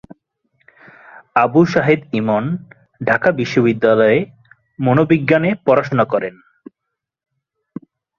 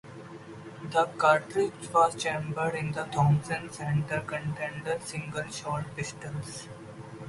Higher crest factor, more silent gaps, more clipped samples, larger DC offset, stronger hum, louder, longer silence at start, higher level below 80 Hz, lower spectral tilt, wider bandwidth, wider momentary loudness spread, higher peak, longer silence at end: about the same, 18 dB vs 22 dB; neither; neither; neither; neither; first, -16 LUFS vs -29 LUFS; first, 1.35 s vs 0.05 s; first, -54 dBFS vs -62 dBFS; first, -8 dB/octave vs -5.5 dB/octave; second, 7.2 kHz vs 11.5 kHz; second, 15 LU vs 20 LU; first, 0 dBFS vs -8 dBFS; first, 1.85 s vs 0 s